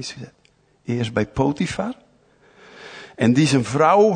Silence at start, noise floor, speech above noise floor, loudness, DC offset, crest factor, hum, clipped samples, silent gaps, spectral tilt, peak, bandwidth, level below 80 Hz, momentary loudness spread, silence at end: 0 s; -56 dBFS; 37 dB; -20 LUFS; under 0.1%; 18 dB; none; under 0.1%; none; -6 dB/octave; -4 dBFS; 9.6 kHz; -50 dBFS; 23 LU; 0 s